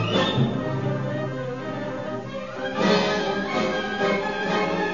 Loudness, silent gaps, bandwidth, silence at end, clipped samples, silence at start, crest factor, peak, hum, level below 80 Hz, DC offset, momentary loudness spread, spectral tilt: -25 LUFS; none; 7.4 kHz; 0 s; under 0.1%; 0 s; 16 dB; -8 dBFS; none; -54 dBFS; 0.4%; 9 LU; -6 dB/octave